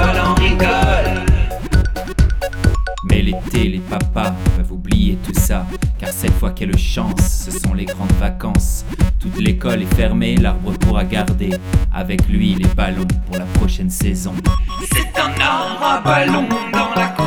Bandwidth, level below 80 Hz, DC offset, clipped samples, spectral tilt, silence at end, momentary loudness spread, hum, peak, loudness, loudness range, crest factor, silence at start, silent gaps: 18.5 kHz; -20 dBFS; under 0.1%; under 0.1%; -5.5 dB/octave; 0 s; 6 LU; none; 0 dBFS; -17 LUFS; 2 LU; 14 dB; 0 s; none